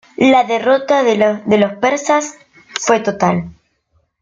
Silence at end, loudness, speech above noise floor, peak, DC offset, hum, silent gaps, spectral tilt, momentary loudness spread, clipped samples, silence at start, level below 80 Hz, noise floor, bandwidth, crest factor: 0.7 s; -14 LUFS; 48 dB; -2 dBFS; under 0.1%; none; none; -4.5 dB/octave; 10 LU; under 0.1%; 0.2 s; -54 dBFS; -62 dBFS; 9.4 kHz; 14 dB